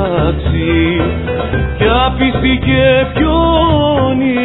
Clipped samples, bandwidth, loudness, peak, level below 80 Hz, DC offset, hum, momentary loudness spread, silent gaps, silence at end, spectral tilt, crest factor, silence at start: under 0.1%; 4.1 kHz; -12 LUFS; 0 dBFS; -22 dBFS; under 0.1%; none; 6 LU; none; 0 s; -10 dB/octave; 12 dB; 0 s